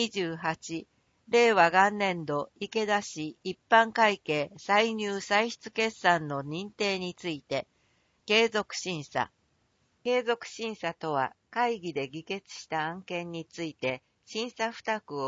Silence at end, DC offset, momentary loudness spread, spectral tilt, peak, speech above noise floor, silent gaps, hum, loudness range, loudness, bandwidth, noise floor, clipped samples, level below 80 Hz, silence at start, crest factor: 0 s; under 0.1%; 14 LU; -4 dB/octave; -8 dBFS; 42 dB; none; none; 7 LU; -29 LUFS; 8 kHz; -71 dBFS; under 0.1%; -72 dBFS; 0 s; 22 dB